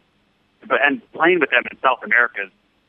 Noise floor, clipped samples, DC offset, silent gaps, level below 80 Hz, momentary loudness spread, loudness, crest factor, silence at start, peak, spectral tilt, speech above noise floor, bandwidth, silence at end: -62 dBFS; under 0.1%; under 0.1%; none; -70 dBFS; 6 LU; -17 LUFS; 18 dB; 0.65 s; -2 dBFS; -7.5 dB/octave; 44 dB; 3.8 kHz; 0.45 s